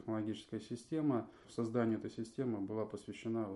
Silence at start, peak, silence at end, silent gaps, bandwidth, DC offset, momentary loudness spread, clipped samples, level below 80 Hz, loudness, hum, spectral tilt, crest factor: 0 s; -22 dBFS; 0 s; none; 11.5 kHz; under 0.1%; 9 LU; under 0.1%; -74 dBFS; -40 LUFS; none; -7.5 dB/octave; 16 dB